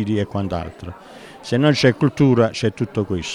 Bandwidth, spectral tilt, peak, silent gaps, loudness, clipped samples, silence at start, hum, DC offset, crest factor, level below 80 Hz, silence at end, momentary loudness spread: 11.5 kHz; -6.5 dB/octave; -2 dBFS; none; -19 LUFS; under 0.1%; 0 s; none; under 0.1%; 18 dB; -46 dBFS; 0 s; 20 LU